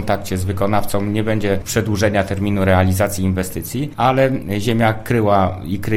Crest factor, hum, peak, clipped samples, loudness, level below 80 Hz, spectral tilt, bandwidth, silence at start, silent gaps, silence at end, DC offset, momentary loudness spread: 16 dB; none; -2 dBFS; under 0.1%; -18 LUFS; -38 dBFS; -6 dB/octave; 16.5 kHz; 0 s; none; 0 s; under 0.1%; 7 LU